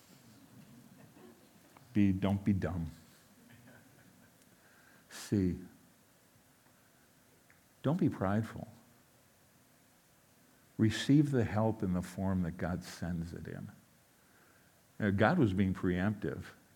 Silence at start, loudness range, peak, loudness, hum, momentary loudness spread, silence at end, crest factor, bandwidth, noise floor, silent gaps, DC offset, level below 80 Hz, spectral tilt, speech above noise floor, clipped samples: 0.55 s; 8 LU; -12 dBFS; -34 LUFS; none; 18 LU; 0.25 s; 24 dB; 18 kHz; -66 dBFS; none; under 0.1%; -66 dBFS; -7 dB/octave; 34 dB; under 0.1%